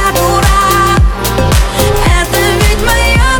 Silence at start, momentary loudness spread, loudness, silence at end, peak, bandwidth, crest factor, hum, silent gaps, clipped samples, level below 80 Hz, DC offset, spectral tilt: 0 s; 2 LU; -10 LUFS; 0 s; 0 dBFS; over 20 kHz; 8 dB; none; none; under 0.1%; -14 dBFS; under 0.1%; -4 dB/octave